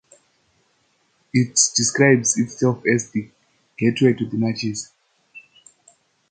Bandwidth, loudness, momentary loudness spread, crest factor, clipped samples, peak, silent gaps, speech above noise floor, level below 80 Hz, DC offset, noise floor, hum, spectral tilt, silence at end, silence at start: 9.8 kHz; -19 LUFS; 13 LU; 20 dB; under 0.1%; -2 dBFS; none; 45 dB; -62 dBFS; under 0.1%; -65 dBFS; none; -4 dB/octave; 0.9 s; 1.35 s